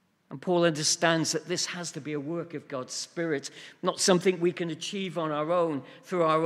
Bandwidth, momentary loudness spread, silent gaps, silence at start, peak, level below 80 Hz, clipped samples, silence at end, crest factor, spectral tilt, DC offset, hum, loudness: 15 kHz; 12 LU; none; 0.3 s; -8 dBFS; -76 dBFS; under 0.1%; 0 s; 22 dB; -3.5 dB/octave; under 0.1%; none; -28 LUFS